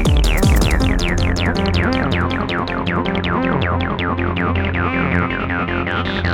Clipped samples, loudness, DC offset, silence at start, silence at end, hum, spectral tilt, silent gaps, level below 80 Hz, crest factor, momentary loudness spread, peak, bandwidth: under 0.1%; -18 LUFS; 0.1%; 0 s; 0 s; none; -6 dB/octave; none; -22 dBFS; 16 dB; 4 LU; -2 dBFS; 17 kHz